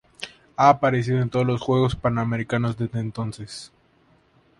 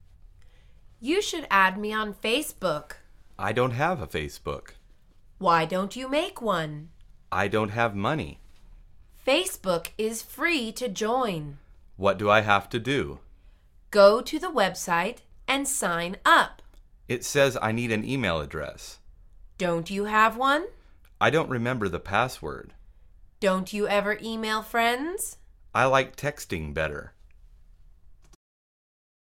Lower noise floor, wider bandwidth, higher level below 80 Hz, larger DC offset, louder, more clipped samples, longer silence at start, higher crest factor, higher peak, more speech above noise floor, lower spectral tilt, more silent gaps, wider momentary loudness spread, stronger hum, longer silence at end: first, -60 dBFS vs -54 dBFS; second, 11.5 kHz vs 17 kHz; about the same, -50 dBFS vs -50 dBFS; neither; first, -22 LUFS vs -26 LUFS; neither; about the same, 0.2 s vs 0.25 s; about the same, 22 dB vs 22 dB; about the same, -2 dBFS vs -4 dBFS; first, 38 dB vs 28 dB; first, -7 dB/octave vs -4 dB/octave; neither; first, 18 LU vs 13 LU; neither; second, 0.9 s vs 1.2 s